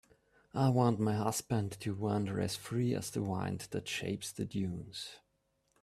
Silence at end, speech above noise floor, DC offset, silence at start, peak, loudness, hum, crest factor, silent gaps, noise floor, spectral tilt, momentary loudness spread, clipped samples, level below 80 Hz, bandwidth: 0.65 s; 43 dB; under 0.1%; 0.55 s; -16 dBFS; -35 LUFS; none; 20 dB; none; -78 dBFS; -5.5 dB/octave; 10 LU; under 0.1%; -66 dBFS; 14.5 kHz